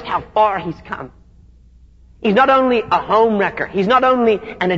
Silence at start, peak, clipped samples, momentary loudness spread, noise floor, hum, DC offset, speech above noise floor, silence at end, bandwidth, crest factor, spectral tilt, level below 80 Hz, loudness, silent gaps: 0 s; -2 dBFS; under 0.1%; 15 LU; -46 dBFS; none; 0.1%; 31 dB; 0 s; 7.6 kHz; 14 dB; -7 dB/octave; -46 dBFS; -15 LUFS; none